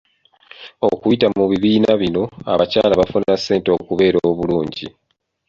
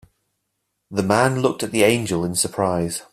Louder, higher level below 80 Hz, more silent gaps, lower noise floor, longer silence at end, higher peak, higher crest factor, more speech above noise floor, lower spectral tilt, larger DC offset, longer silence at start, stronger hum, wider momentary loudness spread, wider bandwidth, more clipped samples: first, -17 LUFS vs -20 LUFS; first, -46 dBFS vs -54 dBFS; neither; second, -47 dBFS vs -75 dBFS; first, 0.6 s vs 0.1 s; about the same, -2 dBFS vs -2 dBFS; about the same, 16 dB vs 20 dB; second, 31 dB vs 55 dB; first, -6.5 dB/octave vs -4.5 dB/octave; neither; second, 0.6 s vs 0.9 s; neither; about the same, 6 LU vs 7 LU; second, 7.6 kHz vs 15.5 kHz; neither